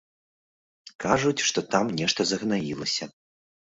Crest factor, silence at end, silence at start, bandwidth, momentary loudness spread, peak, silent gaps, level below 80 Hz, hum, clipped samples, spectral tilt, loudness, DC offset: 24 dB; 0.7 s; 0.85 s; 8 kHz; 6 LU; -6 dBFS; 0.95-0.99 s; -60 dBFS; none; under 0.1%; -3.5 dB/octave; -25 LUFS; under 0.1%